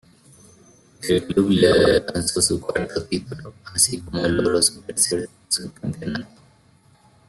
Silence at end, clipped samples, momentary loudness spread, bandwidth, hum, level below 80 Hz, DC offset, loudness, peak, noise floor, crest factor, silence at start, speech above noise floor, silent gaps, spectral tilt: 1.05 s; under 0.1%; 14 LU; 12.5 kHz; none; -48 dBFS; under 0.1%; -20 LUFS; -4 dBFS; -55 dBFS; 18 dB; 1 s; 34 dB; none; -3.5 dB/octave